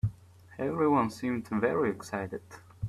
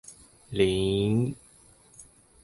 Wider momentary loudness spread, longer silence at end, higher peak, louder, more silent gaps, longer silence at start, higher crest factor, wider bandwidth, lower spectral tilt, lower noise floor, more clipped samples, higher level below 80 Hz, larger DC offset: second, 13 LU vs 20 LU; second, 0 s vs 0.4 s; second, -14 dBFS vs -10 dBFS; second, -30 LUFS vs -27 LUFS; neither; about the same, 0.05 s vs 0.1 s; about the same, 18 dB vs 20 dB; first, 14.5 kHz vs 11.5 kHz; about the same, -7.5 dB/octave vs -6.5 dB/octave; second, -52 dBFS vs -57 dBFS; neither; second, -56 dBFS vs -50 dBFS; neither